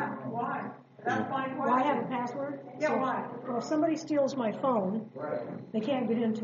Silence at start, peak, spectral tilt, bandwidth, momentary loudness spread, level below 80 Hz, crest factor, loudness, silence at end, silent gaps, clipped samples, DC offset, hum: 0 s; -16 dBFS; -5 dB/octave; 7.4 kHz; 8 LU; -80 dBFS; 16 dB; -31 LUFS; 0 s; none; under 0.1%; under 0.1%; none